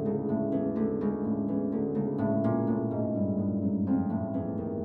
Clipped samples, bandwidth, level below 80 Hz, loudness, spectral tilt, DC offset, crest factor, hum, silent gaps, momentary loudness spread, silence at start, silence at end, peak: under 0.1%; 2.5 kHz; -60 dBFS; -30 LUFS; -13 dB/octave; under 0.1%; 12 dB; none; none; 3 LU; 0 s; 0 s; -18 dBFS